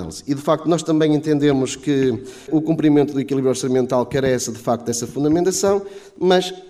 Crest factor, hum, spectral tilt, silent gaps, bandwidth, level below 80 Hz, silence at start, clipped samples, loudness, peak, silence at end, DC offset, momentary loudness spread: 16 dB; none; -5.5 dB/octave; none; 15 kHz; -52 dBFS; 0 s; under 0.1%; -19 LUFS; -4 dBFS; 0 s; under 0.1%; 6 LU